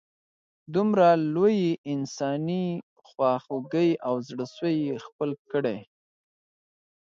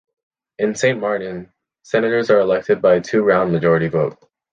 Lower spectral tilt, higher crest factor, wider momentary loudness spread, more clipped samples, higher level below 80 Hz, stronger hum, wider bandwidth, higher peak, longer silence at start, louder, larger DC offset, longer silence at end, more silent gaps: about the same, -7 dB/octave vs -6 dB/octave; about the same, 18 dB vs 16 dB; first, 12 LU vs 8 LU; neither; second, -74 dBFS vs -54 dBFS; neither; second, 7.4 kHz vs 9.6 kHz; second, -8 dBFS vs -2 dBFS; about the same, 0.7 s vs 0.6 s; second, -26 LUFS vs -17 LUFS; neither; first, 1.2 s vs 0.4 s; first, 1.78-1.84 s, 2.83-2.96 s, 5.12-5.19 s, 5.39-5.45 s vs none